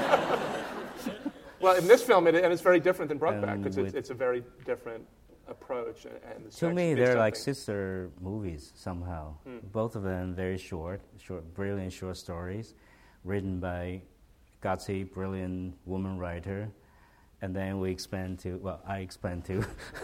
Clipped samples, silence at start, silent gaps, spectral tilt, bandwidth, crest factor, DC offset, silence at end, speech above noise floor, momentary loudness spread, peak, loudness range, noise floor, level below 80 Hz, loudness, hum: under 0.1%; 0 s; none; -6 dB/octave; 16.5 kHz; 24 dB; under 0.1%; 0 s; 30 dB; 18 LU; -8 dBFS; 12 LU; -60 dBFS; -56 dBFS; -31 LUFS; none